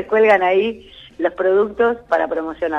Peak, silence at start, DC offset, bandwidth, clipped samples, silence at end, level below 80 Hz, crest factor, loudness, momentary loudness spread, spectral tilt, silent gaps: -4 dBFS; 0 s; under 0.1%; 7 kHz; under 0.1%; 0 s; -52 dBFS; 14 dB; -17 LUFS; 10 LU; -6 dB/octave; none